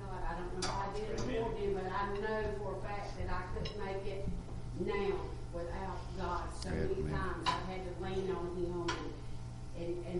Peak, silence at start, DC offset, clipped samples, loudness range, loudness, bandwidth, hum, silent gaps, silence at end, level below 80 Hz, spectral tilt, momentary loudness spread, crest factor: -20 dBFS; 0 s; under 0.1%; under 0.1%; 2 LU; -39 LUFS; 11.5 kHz; none; none; 0 s; -46 dBFS; -5.5 dB/octave; 7 LU; 18 dB